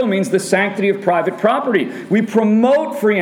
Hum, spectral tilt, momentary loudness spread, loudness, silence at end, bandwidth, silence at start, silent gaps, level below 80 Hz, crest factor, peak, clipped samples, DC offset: none; -6 dB/octave; 5 LU; -16 LUFS; 0 s; 15.5 kHz; 0 s; none; -68 dBFS; 14 dB; -2 dBFS; under 0.1%; under 0.1%